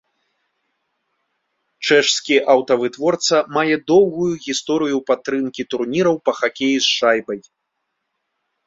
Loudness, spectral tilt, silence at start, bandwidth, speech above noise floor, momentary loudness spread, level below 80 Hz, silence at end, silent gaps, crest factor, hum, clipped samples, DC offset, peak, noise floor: -17 LUFS; -3.5 dB/octave; 1.8 s; 7.8 kHz; 58 dB; 8 LU; -62 dBFS; 1.25 s; none; 18 dB; none; under 0.1%; under 0.1%; -2 dBFS; -75 dBFS